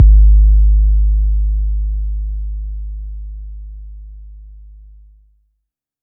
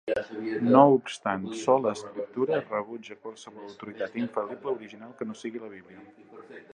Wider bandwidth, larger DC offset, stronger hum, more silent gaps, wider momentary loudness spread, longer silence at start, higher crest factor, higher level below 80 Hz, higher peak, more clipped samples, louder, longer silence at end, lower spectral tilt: second, 0.4 kHz vs 10.5 kHz; neither; neither; neither; about the same, 24 LU vs 23 LU; about the same, 0 s vs 0.05 s; second, 14 dB vs 24 dB; first, -14 dBFS vs -72 dBFS; first, 0 dBFS vs -4 dBFS; neither; first, -16 LUFS vs -27 LUFS; first, 1.45 s vs 0.15 s; first, -22 dB/octave vs -6 dB/octave